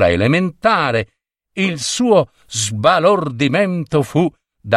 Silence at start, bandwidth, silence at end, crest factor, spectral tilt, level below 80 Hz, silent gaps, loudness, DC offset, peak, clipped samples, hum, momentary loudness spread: 0 s; 13 kHz; 0 s; 16 dB; -5 dB/octave; -48 dBFS; none; -16 LUFS; under 0.1%; 0 dBFS; under 0.1%; none; 8 LU